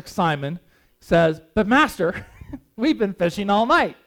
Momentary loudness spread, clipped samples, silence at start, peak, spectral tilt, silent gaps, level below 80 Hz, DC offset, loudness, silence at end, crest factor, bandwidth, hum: 19 LU; under 0.1%; 0.05 s; -4 dBFS; -6 dB/octave; none; -46 dBFS; under 0.1%; -20 LUFS; 0.15 s; 16 dB; 17.5 kHz; none